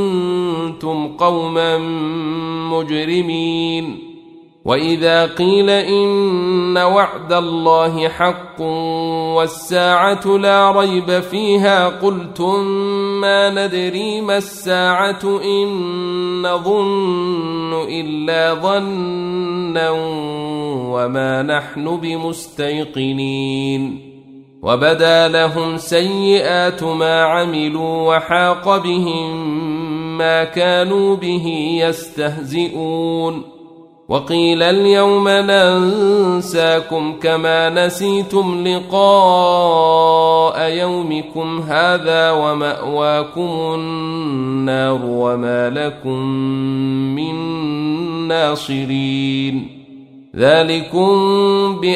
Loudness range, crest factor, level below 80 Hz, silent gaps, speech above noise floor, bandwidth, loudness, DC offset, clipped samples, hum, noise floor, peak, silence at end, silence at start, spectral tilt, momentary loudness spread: 6 LU; 14 dB; -56 dBFS; none; 26 dB; 15 kHz; -16 LUFS; under 0.1%; under 0.1%; none; -42 dBFS; 0 dBFS; 0 s; 0 s; -5.5 dB/octave; 9 LU